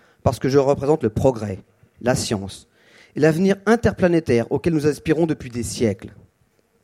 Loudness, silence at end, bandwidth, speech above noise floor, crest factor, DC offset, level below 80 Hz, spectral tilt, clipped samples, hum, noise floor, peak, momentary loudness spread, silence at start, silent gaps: -20 LUFS; 0.75 s; 15.5 kHz; 43 dB; 18 dB; under 0.1%; -44 dBFS; -6 dB/octave; under 0.1%; none; -63 dBFS; -2 dBFS; 12 LU; 0.25 s; none